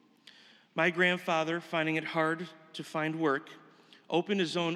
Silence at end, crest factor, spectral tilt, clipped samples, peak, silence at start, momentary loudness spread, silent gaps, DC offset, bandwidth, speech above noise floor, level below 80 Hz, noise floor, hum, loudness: 0 s; 20 dB; -5 dB/octave; under 0.1%; -12 dBFS; 0.75 s; 12 LU; none; under 0.1%; 13.5 kHz; 27 dB; under -90 dBFS; -58 dBFS; none; -31 LUFS